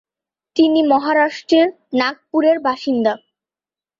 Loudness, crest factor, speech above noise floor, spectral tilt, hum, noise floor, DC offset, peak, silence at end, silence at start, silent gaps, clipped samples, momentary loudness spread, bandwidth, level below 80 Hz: -17 LUFS; 14 dB; over 74 dB; -5 dB/octave; none; under -90 dBFS; under 0.1%; -2 dBFS; 0.85 s; 0.55 s; none; under 0.1%; 5 LU; 7.4 kHz; -66 dBFS